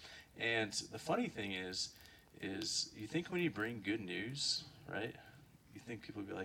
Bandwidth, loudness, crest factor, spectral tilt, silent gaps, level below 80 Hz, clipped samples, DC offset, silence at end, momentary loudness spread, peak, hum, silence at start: 19 kHz; -41 LUFS; 18 dB; -3 dB/octave; none; -72 dBFS; under 0.1%; under 0.1%; 0 s; 17 LU; -24 dBFS; none; 0 s